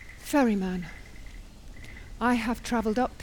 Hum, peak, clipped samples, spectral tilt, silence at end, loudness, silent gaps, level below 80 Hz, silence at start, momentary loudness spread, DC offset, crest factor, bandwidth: none; -14 dBFS; under 0.1%; -5.5 dB/octave; 0 s; -27 LUFS; none; -46 dBFS; 0 s; 23 LU; under 0.1%; 16 dB; over 20 kHz